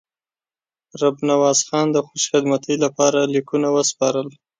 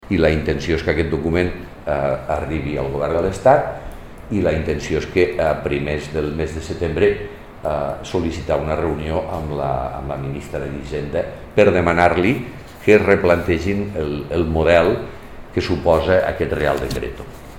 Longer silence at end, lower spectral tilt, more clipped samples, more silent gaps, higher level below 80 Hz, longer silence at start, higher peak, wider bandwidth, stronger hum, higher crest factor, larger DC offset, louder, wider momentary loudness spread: first, 0.3 s vs 0 s; second, -3.5 dB/octave vs -6.5 dB/octave; neither; neither; second, -68 dBFS vs -34 dBFS; first, 0.95 s vs 0 s; about the same, -2 dBFS vs 0 dBFS; second, 9.6 kHz vs 16.5 kHz; neither; about the same, 18 dB vs 18 dB; second, under 0.1% vs 0.4%; about the same, -19 LUFS vs -19 LUFS; second, 5 LU vs 12 LU